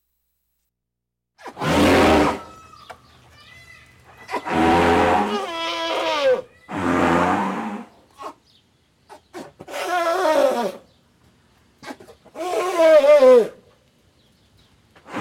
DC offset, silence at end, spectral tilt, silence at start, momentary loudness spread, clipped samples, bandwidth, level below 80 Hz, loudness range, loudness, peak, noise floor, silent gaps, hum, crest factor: under 0.1%; 0 s; -5 dB/octave; 1.45 s; 25 LU; under 0.1%; 16.5 kHz; -46 dBFS; 7 LU; -18 LUFS; -4 dBFS; -82 dBFS; none; none; 16 dB